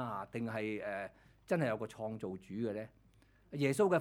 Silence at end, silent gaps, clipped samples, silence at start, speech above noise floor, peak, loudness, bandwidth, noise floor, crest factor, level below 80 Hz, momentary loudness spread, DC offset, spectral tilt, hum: 0 s; none; under 0.1%; 0 s; 30 dB; -18 dBFS; -38 LUFS; 18 kHz; -67 dBFS; 18 dB; -70 dBFS; 12 LU; under 0.1%; -6.5 dB/octave; none